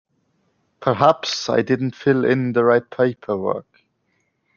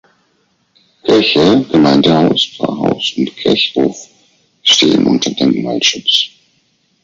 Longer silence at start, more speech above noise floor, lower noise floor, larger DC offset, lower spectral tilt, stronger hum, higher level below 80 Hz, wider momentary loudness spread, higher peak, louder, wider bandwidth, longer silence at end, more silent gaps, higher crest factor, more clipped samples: second, 0.8 s vs 1.05 s; about the same, 50 dB vs 47 dB; first, -69 dBFS vs -59 dBFS; neither; first, -6 dB/octave vs -4 dB/octave; neither; second, -64 dBFS vs -50 dBFS; about the same, 8 LU vs 8 LU; about the same, -2 dBFS vs 0 dBFS; second, -19 LUFS vs -12 LUFS; about the same, 7.2 kHz vs 7.8 kHz; first, 0.95 s vs 0.75 s; neither; first, 20 dB vs 14 dB; neither